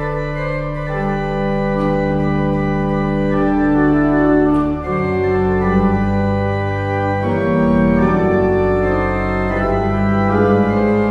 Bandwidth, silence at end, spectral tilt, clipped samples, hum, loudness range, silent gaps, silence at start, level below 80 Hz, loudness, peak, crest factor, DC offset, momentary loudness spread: 7.4 kHz; 0 s; -9.5 dB/octave; under 0.1%; none; 2 LU; none; 0 s; -30 dBFS; -16 LUFS; -2 dBFS; 14 dB; under 0.1%; 5 LU